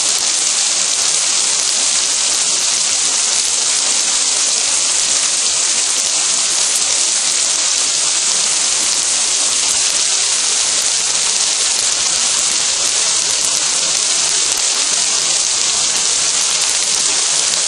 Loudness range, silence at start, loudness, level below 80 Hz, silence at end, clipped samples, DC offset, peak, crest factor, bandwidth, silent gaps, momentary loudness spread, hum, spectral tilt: 0 LU; 0 s; -12 LUFS; -54 dBFS; 0 s; under 0.1%; under 0.1%; 0 dBFS; 16 dB; 17 kHz; none; 1 LU; none; 2.5 dB/octave